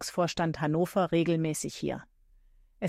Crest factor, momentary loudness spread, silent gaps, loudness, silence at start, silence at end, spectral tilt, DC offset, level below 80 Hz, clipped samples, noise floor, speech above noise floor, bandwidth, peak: 16 dB; 9 LU; none; -29 LUFS; 0 s; 0 s; -5.5 dB/octave; under 0.1%; -58 dBFS; under 0.1%; -60 dBFS; 31 dB; 15.5 kHz; -14 dBFS